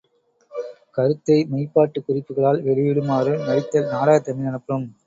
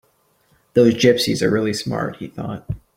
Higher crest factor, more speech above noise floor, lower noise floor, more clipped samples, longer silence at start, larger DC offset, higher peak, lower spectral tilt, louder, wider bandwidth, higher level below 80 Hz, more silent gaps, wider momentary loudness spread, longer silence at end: about the same, 18 dB vs 18 dB; about the same, 42 dB vs 43 dB; about the same, -61 dBFS vs -61 dBFS; neither; second, 0.5 s vs 0.75 s; neither; about the same, -2 dBFS vs -2 dBFS; first, -8 dB/octave vs -5.5 dB/octave; about the same, -20 LUFS vs -18 LUFS; second, 7.6 kHz vs 16.5 kHz; second, -62 dBFS vs -48 dBFS; neither; second, 11 LU vs 16 LU; about the same, 0.15 s vs 0.2 s